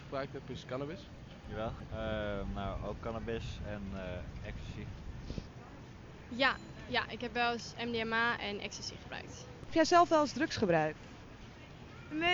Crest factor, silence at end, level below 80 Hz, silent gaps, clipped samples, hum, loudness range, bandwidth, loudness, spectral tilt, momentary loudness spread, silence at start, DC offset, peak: 24 dB; 0 s; -52 dBFS; none; under 0.1%; none; 10 LU; 7.8 kHz; -35 LUFS; -4.5 dB/octave; 20 LU; 0 s; under 0.1%; -12 dBFS